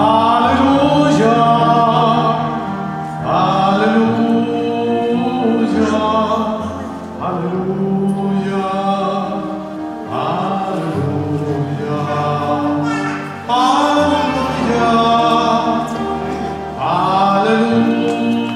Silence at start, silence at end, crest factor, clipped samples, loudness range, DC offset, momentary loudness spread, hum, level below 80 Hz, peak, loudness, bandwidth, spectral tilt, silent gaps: 0 s; 0 s; 14 dB; under 0.1%; 5 LU; under 0.1%; 10 LU; none; -46 dBFS; 0 dBFS; -15 LUFS; 12 kHz; -6.5 dB/octave; none